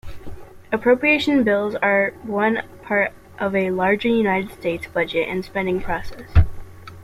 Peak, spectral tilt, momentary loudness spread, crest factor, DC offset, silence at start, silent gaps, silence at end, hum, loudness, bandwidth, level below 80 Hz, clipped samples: -2 dBFS; -7 dB/octave; 10 LU; 18 dB; under 0.1%; 0.05 s; none; 0 s; none; -20 LUFS; 14.5 kHz; -34 dBFS; under 0.1%